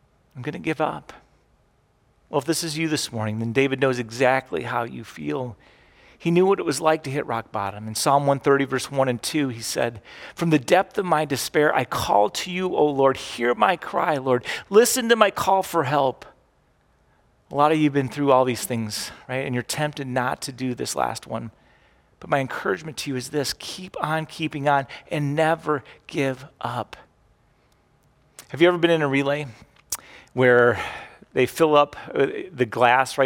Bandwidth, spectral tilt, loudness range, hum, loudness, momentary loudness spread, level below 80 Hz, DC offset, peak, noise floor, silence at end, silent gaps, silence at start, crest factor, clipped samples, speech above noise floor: 18 kHz; -4.5 dB/octave; 7 LU; none; -23 LUFS; 13 LU; -60 dBFS; under 0.1%; -2 dBFS; -63 dBFS; 0 s; none; 0.35 s; 22 dB; under 0.1%; 40 dB